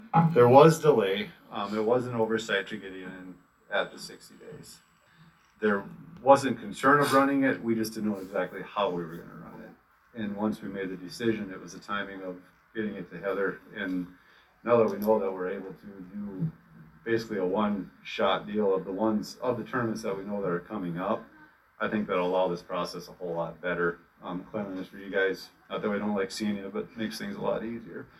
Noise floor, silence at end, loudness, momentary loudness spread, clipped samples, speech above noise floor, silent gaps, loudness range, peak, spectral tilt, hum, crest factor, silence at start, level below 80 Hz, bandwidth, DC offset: -59 dBFS; 0.15 s; -28 LUFS; 18 LU; under 0.1%; 31 dB; none; 9 LU; -4 dBFS; -6 dB/octave; none; 24 dB; 0 s; -64 dBFS; 15 kHz; under 0.1%